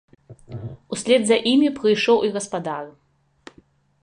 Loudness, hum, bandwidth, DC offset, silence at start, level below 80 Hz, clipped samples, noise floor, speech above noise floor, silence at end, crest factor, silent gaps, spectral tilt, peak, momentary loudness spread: -20 LUFS; none; 11 kHz; under 0.1%; 0.3 s; -60 dBFS; under 0.1%; -56 dBFS; 36 dB; 1.15 s; 18 dB; none; -4 dB/octave; -4 dBFS; 19 LU